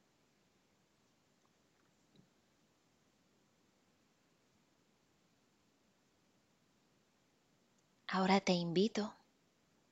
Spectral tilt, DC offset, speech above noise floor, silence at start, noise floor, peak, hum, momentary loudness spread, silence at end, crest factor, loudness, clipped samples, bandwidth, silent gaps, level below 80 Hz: -5.5 dB/octave; under 0.1%; 42 dB; 8.1 s; -76 dBFS; -18 dBFS; none; 13 LU; 0.8 s; 26 dB; -35 LUFS; under 0.1%; 8 kHz; none; -86 dBFS